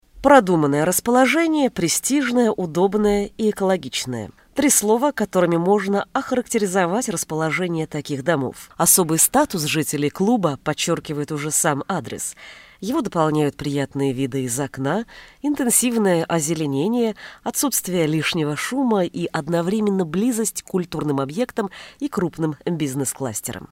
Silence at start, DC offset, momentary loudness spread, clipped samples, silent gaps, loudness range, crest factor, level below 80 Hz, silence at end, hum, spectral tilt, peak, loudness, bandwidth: 0.15 s; under 0.1%; 10 LU; under 0.1%; none; 4 LU; 20 dB; -52 dBFS; 0.05 s; none; -4 dB/octave; 0 dBFS; -20 LUFS; 16 kHz